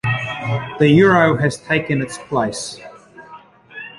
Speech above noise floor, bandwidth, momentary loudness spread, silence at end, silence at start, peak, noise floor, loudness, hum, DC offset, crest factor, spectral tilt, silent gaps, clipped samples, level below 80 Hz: 26 dB; 11.5 kHz; 19 LU; 0.1 s; 0.05 s; -2 dBFS; -42 dBFS; -17 LUFS; none; under 0.1%; 16 dB; -6 dB/octave; none; under 0.1%; -50 dBFS